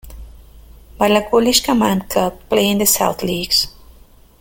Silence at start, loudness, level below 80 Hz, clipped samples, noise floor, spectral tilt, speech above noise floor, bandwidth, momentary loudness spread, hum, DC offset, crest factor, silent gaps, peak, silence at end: 0.05 s; -16 LUFS; -40 dBFS; under 0.1%; -46 dBFS; -3 dB/octave; 30 dB; 17 kHz; 6 LU; none; under 0.1%; 18 dB; none; 0 dBFS; 0.7 s